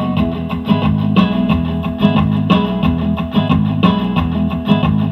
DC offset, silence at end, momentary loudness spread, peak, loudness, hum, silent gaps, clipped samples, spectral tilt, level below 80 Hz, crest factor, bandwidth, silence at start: under 0.1%; 0 s; 4 LU; 0 dBFS; -15 LUFS; none; none; under 0.1%; -9 dB/octave; -30 dBFS; 14 dB; 5.8 kHz; 0 s